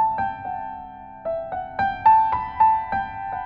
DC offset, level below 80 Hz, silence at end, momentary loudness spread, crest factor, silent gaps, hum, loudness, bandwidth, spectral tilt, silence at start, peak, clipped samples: under 0.1%; -48 dBFS; 0 s; 17 LU; 16 dB; none; none; -22 LUFS; 5.2 kHz; -7.5 dB/octave; 0 s; -6 dBFS; under 0.1%